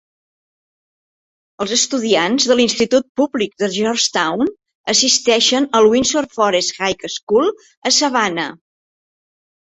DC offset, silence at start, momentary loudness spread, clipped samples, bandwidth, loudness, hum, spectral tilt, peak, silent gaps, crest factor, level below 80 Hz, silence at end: under 0.1%; 1.6 s; 9 LU; under 0.1%; 8.4 kHz; -15 LUFS; none; -2 dB/octave; 0 dBFS; 3.09-3.15 s, 4.75-4.84 s, 7.23-7.27 s, 7.77-7.82 s; 18 dB; -56 dBFS; 1.15 s